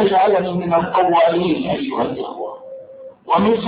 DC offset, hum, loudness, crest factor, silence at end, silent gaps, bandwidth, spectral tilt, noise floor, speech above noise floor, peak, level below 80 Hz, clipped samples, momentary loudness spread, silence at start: under 0.1%; none; -17 LUFS; 14 dB; 0 s; none; 5 kHz; -11 dB/octave; -38 dBFS; 21 dB; -4 dBFS; -52 dBFS; under 0.1%; 21 LU; 0 s